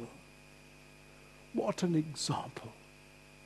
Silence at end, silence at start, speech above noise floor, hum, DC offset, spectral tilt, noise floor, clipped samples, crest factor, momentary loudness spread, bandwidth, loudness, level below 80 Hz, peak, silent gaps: 0 s; 0 s; 23 dB; 50 Hz at -60 dBFS; under 0.1%; -5 dB/octave; -57 dBFS; under 0.1%; 20 dB; 23 LU; 12.5 kHz; -35 LUFS; -68 dBFS; -20 dBFS; none